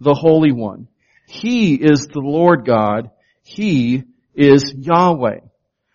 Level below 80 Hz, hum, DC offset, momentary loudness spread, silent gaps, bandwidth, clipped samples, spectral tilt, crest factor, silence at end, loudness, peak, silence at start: -52 dBFS; none; under 0.1%; 13 LU; none; 7.2 kHz; under 0.1%; -6 dB/octave; 16 dB; 0.55 s; -15 LUFS; 0 dBFS; 0 s